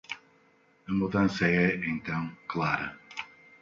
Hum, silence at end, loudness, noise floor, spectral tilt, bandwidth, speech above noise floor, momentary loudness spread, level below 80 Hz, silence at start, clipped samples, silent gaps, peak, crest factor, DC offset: none; 0.35 s; -29 LUFS; -64 dBFS; -7 dB/octave; 7.4 kHz; 36 dB; 17 LU; -58 dBFS; 0.1 s; under 0.1%; none; -12 dBFS; 18 dB; under 0.1%